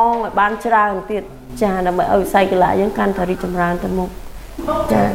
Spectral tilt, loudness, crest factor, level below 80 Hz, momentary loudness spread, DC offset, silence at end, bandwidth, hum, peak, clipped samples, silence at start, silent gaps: -6.5 dB/octave; -17 LUFS; 16 dB; -36 dBFS; 11 LU; under 0.1%; 0 s; 16.5 kHz; none; 0 dBFS; under 0.1%; 0 s; none